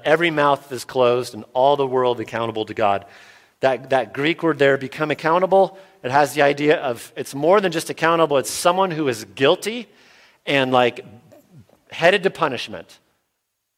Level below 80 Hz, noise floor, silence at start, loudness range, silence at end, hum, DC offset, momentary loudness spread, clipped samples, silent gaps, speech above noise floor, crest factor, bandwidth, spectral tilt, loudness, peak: -64 dBFS; -75 dBFS; 0.05 s; 3 LU; 0.95 s; none; under 0.1%; 10 LU; under 0.1%; none; 56 dB; 20 dB; 16.5 kHz; -4.5 dB/octave; -19 LUFS; -2 dBFS